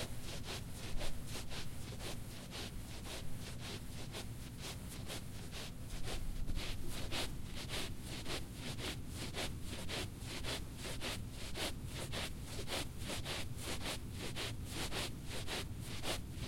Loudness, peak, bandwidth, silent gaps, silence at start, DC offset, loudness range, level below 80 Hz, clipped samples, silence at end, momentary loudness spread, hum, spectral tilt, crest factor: -44 LUFS; -26 dBFS; 16.5 kHz; none; 0 s; under 0.1%; 4 LU; -48 dBFS; under 0.1%; 0 s; 5 LU; none; -3.5 dB/octave; 16 dB